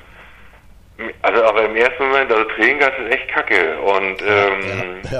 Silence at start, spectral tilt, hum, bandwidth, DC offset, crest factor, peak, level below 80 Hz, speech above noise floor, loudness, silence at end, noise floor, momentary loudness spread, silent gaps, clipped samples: 0.2 s; -5 dB/octave; none; 11.5 kHz; under 0.1%; 18 dB; 0 dBFS; -46 dBFS; 27 dB; -16 LUFS; 0 s; -44 dBFS; 7 LU; none; under 0.1%